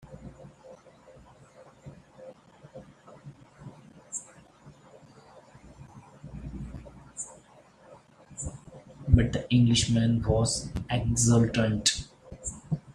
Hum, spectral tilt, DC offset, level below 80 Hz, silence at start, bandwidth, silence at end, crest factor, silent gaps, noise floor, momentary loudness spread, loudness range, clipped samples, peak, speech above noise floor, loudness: none; -5 dB/octave; under 0.1%; -44 dBFS; 0.05 s; 12.5 kHz; 0.05 s; 24 dB; none; -56 dBFS; 27 LU; 22 LU; under 0.1%; -6 dBFS; 32 dB; -27 LUFS